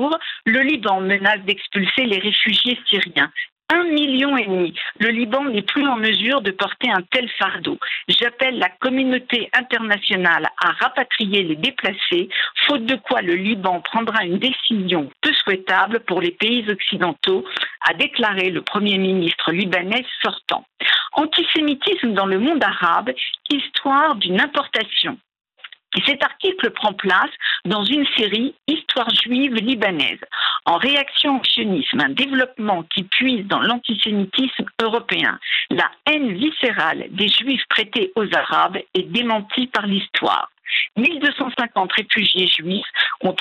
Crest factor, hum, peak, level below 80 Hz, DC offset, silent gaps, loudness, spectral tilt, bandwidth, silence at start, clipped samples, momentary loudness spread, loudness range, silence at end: 20 dB; none; 0 dBFS; -66 dBFS; under 0.1%; 3.52-3.56 s; -18 LUFS; -5.5 dB/octave; 10.5 kHz; 0 s; under 0.1%; 5 LU; 2 LU; 0 s